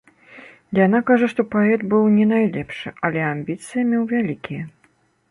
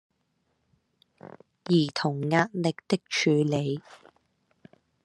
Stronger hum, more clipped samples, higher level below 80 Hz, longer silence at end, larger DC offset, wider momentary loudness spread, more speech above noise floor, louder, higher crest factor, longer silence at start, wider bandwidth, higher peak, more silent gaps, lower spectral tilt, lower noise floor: neither; neither; first, -60 dBFS vs -72 dBFS; second, 0.6 s vs 1.1 s; neither; first, 13 LU vs 8 LU; second, 42 dB vs 48 dB; first, -19 LUFS vs -26 LUFS; second, 16 dB vs 22 dB; second, 0.35 s vs 1.7 s; about the same, 11.5 kHz vs 11.5 kHz; first, -4 dBFS vs -8 dBFS; neither; first, -7.5 dB/octave vs -5.5 dB/octave; second, -61 dBFS vs -74 dBFS